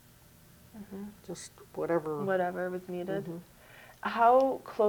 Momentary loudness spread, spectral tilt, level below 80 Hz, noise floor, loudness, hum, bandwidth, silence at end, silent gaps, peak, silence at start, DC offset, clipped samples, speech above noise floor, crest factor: 20 LU; -6 dB/octave; -68 dBFS; -58 dBFS; -30 LUFS; none; over 20 kHz; 0 s; none; -12 dBFS; 0.75 s; under 0.1%; under 0.1%; 28 dB; 20 dB